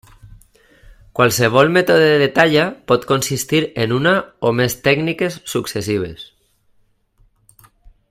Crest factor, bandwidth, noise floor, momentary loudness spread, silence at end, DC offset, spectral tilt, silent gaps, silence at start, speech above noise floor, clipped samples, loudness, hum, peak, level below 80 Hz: 18 dB; 16 kHz; -58 dBFS; 10 LU; 1.85 s; under 0.1%; -4.5 dB/octave; none; 0.25 s; 42 dB; under 0.1%; -16 LUFS; none; 0 dBFS; -50 dBFS